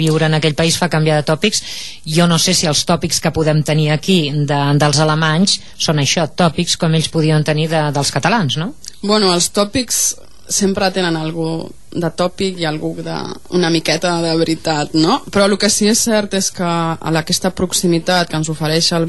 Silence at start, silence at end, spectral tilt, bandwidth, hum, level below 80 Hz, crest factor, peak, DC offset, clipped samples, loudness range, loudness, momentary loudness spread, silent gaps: 0 s; 0 s; -4 dB/octave; 12.5 kHz; none; -44 dBFS; 14 dB; 0 dBFS; 2%; under 0.1%; 4 LU; -15 LUFS; 8 LU; none